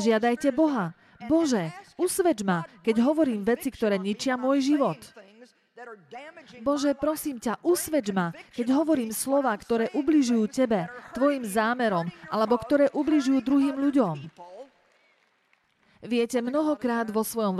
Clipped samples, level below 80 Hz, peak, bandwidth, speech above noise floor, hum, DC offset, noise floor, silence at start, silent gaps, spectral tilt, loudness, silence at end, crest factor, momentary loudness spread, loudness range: under 0.1%; -62 dBFS; -10 dBFS; 14.5 kHz; 43 dB; none; under 0.1%; -68 dBFS; 0 s; none; -5 dB/octave; -26 LUFS; 0 s; 16 dB; 11 LU; 5 LU